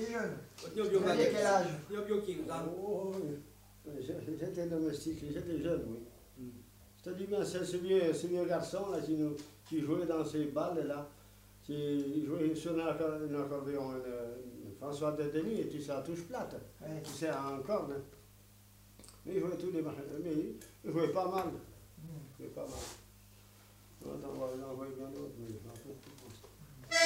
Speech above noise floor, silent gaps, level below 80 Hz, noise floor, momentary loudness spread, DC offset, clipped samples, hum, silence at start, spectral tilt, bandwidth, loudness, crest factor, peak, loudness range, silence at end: 24 dB; none; -64 dBFS; -61 dBFS; 18 LU; under 0.1%; under 0.1%; none; 0 s; -5 dB/octave; 16 kHz; -37 LUFS; 24 dB; -14 dBFS; 10 LU; 0 s